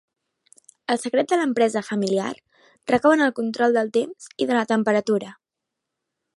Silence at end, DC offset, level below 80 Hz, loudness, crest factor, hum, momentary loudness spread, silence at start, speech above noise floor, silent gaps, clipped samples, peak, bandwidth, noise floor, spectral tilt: 1.05 s; under 0.1%; -68 dBFS; -22 LUFS; 18 dB; none; 13 LU; 0.9 s; 62 dB; none; under 0.1%; -4 dBFS; 11.5 kHz; -83 dBFS; -5 dB/octave